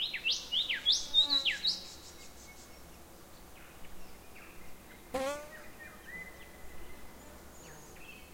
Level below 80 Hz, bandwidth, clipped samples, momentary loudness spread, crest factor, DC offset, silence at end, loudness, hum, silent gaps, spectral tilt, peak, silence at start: -58 dBFS; 16.5 kHz; under 0.1%; 26 LU; 22 dB; 0.1%; 0 s; -30 LUFS; none; none; -0.5 dB/octave; -16 dBFS; 0 s